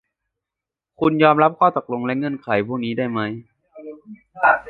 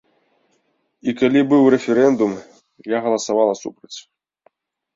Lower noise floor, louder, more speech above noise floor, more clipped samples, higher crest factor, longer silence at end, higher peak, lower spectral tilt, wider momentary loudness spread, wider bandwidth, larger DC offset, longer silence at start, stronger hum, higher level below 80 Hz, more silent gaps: first, -87 dBFS vs -66 dBFS; about the same, -19 LUFS vs -17 LUFS; first, 68 dB vs 49 dB; neither; about the same, 20 dB vs 18 dB; second, 0 s vs 0.95 s; about the same, -2 dBFS vs -2 dBFS; first, -9 dB/octave vs -5.5 dB/octave; about the same, 23 LU vs 22 LU; second, 5 kHz vs 7.8 kHz; neither; about the same, 1 s vs 1.05 s; neither; about the same, -60 dBFS vs -64 dBFS; neither